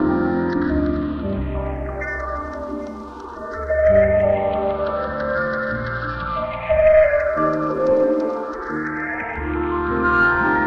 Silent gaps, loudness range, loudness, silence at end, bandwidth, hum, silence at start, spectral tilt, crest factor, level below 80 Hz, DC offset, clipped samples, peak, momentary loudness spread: none; 5 LU; -20 LUFS; 0 s; 6.4 kHz; none; 0 s; -8.5 dB/octave; 16 dB; -34 dBFS; under 0.1%; under 0.1%; -4 dBFS; 13 LU